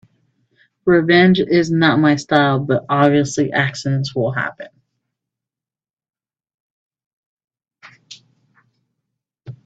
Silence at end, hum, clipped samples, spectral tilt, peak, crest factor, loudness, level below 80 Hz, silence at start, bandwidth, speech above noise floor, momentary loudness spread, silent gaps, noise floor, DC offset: 0.1 s; none; under 0.1%; -6 dB/octave; 0 dBFS; 18 dB; -16 LUFS; -58 dBFS; 0.85 s; 8.2 kHz; over 75 dB; 9 LU; 5.90-5.97 s, 6.54-6.91 s, 7.06-7.37 s, 7.44-7.48 s; under -90 dBFS; under 0.1%